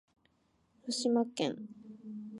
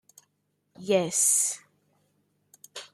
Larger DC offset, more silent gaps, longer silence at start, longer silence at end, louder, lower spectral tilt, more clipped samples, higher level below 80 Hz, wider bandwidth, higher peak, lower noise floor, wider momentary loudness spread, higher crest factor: neither; neither; about the same, 0.85 s vs 0.8 s; about the same, 0 s vs 0.1 s; second, -33 LUFS vs -23 LUFS; first, -4 dB/octave vs -2.5 dB/octave; neither; about the same, -82 dBFS vs -82 dBFS; second, 11.5 kHz vs 15.5 kHz; second, -18 dBFS vs -10 dBFS; about the same, -73 dBFS vs -75 dBFS; second, 18 LU vs 22 LU; about the same, 18 dB vs 20 dB